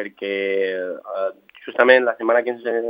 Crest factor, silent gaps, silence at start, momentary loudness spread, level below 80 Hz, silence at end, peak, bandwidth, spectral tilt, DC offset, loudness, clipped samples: 20 dB; none; 0 s; 14 LU; -80 dBFS; 0 s; 0 dBFS; 5 kHz; -6.5 dB/octave; under 0.1%; -20 LUFS; under 0.1%